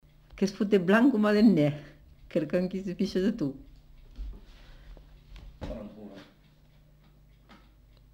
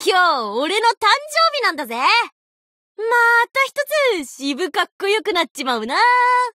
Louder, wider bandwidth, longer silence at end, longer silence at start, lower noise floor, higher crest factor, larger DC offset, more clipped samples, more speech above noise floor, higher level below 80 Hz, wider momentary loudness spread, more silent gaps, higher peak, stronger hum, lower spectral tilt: second, -26 LUFS vs -17 LUFS; second, 13 kHz vs 16 kHz; first, 1.9 s vs 0.05 s; first, 0.35 s vs 0 s; second, -59 dBFS vs under -90 dBFS; first, 20 dB vs 14 dB; neither; neither; second, 33 dB vs over 72 dB; first, -50 dBFS vs -70 dBFS; first, 24 LU vs 8 LU; second, none vs 0.97-1.01 s, 2.32-2.95 s, 4.92-4.99 s, 5.51-5.55 s; second, -10 dBFS vs -4 dBFS; neither; first, -7.5 dB/octave vs -1 dB/octave